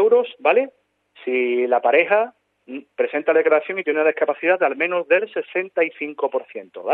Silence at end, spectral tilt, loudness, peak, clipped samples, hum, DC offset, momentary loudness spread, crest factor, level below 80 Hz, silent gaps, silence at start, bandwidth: 0 s; -7.5 dB/octave; -20 LUFS; -2 dBFS; under 0.1%; none; under 0.1%; 14 LU; 18 dB; -84 dBFS; none; 0 s; 4 kHz